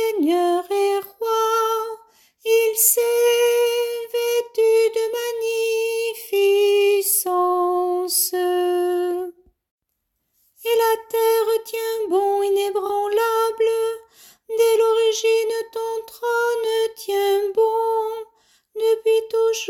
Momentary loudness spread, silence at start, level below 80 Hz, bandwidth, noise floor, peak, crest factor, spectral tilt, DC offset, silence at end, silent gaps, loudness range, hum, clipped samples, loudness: 9 LU; 0 s; -70 dBFS; 17 kHz; -76 dBFS; -4 dBFS; 18 dB; -0.5 dB/octave; under 0.1%; 0 s; 9.71-9.78 s; 4 LU; none; under 0.1%; -20 LUFS